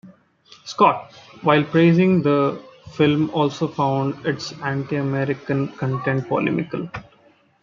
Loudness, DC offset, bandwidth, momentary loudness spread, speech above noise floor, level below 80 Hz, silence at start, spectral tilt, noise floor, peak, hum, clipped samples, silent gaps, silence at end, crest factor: -20 LUFS; under 0.1%; 7.4 kHz; 14 LU; 36 dB; -60 dBFS; 0.05 s; -7.5 dB/octave; -56 dBFS; -2 dBFS; none; under 0.1%; none; 0.6 s; 20 dB